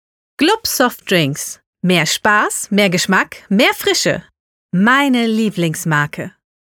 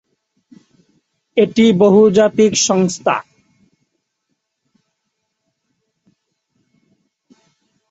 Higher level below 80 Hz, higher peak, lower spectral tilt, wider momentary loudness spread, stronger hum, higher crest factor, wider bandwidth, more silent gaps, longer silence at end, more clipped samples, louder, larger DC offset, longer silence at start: about the same, -56 dBFS vs -60 dBFS; about the same, -2 dBFS vs -2 dBFS; about the same, -4 dB/octave vs -4.5 dB/octave; about the same, 9 LU vs 9 LU; neither; about the same, 14 dB vs 16 dB; first, over 20 kHz vs 8.2 kHz; first, 1.67-1.73 s, 4.40-4.69 s vs none; second, 0.45 s vs 4.7 s; neither; about the same, -15 LUFS vs -13 LUFS; neither; second, 0.4 s vs 1.35 s